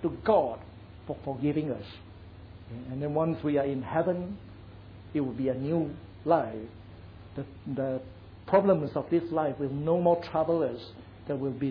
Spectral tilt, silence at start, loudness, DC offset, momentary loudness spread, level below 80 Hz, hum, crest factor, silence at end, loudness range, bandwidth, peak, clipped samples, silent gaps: -10.5 dB/octave; 0 s; -29 LUFS; under 0.1%; 23 LU; -56 dBFS; none; 20 dB; 0 s; 5 LU; 5.4 kHz; -10 dBFS; under 0.1%; none